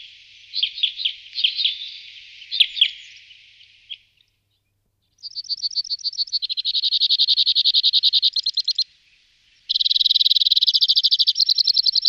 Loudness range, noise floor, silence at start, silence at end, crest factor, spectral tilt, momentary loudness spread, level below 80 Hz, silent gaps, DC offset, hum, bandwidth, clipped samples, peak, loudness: 10 LU; -70 dBFS; 0 s; 0 s; 18 dB; 5 dB/octave; 16 LU; -72 dBFS; none; under 0.1%; none; 15 kHz; under 0.1%; -2 dBFS; -17 LUFS